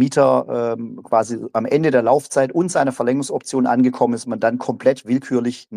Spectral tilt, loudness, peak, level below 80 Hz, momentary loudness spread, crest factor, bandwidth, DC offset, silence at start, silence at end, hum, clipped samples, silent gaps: -6 dB/octave; -19 LUFS; -2 dBFS; -66 dBFS; 7 LU; 16 dB; 12 kHz; under 0.1%; 0 s; 0 s; none; under 0.1%; none